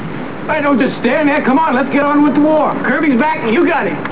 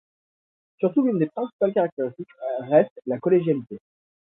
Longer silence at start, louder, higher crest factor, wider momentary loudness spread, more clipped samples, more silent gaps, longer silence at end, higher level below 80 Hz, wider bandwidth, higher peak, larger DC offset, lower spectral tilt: second, 0 s vs 0.8 s; first, -13 LUFS vs -23 LUFS; second, 12 dB vs 20 dB; second, 5 LU vs 11 LU; neither; second, none vs 1.53-1.59 s, 1.92-1.97 s, 2.91-2.96 s; second, 0 s vs 0.6 s; first, -50 dBFS vs -72 dBFS; about the same, 4 kHz vs 3.9 kHz; first, -2 dBFS vs -6 dBFS; first, 3% vs under 0.1%; second, -10 dB/octave vs -12.5 dB/octave